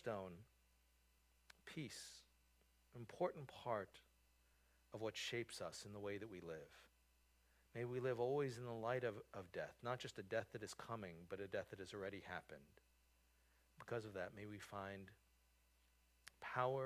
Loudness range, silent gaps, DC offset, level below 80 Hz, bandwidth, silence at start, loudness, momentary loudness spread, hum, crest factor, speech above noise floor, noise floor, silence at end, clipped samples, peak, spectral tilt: 8 LU; none; under 0.1%; -76 dBFS; 15 kHz; 0 s; -49 LUFS; 18 LU; none; 24 dB; 29 dB; -77 dBFS; 0 s; under 0.1%; -26 dBFS; -5 dB/octave